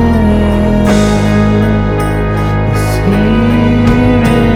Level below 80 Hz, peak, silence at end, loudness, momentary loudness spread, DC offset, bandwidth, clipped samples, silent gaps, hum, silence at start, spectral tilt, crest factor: -18 dBFS; 0 dBFS; 0 s; -10 LUFS; 4 LU; under 0.1%; 15.5 kHz; under 0.1%; none; none; 0 s; -7 dB/octave; 8 dB